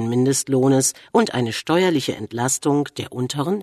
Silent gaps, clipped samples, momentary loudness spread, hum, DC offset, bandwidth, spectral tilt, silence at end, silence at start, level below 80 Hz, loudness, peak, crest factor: none; under 0.1%; 8 LU; none; under 0.1%; 13.5 kHz; -4.5 dB/octave; 0 s; 0 s; -62 dBFS; -20 LUFS; -2 dBFS; 18 dB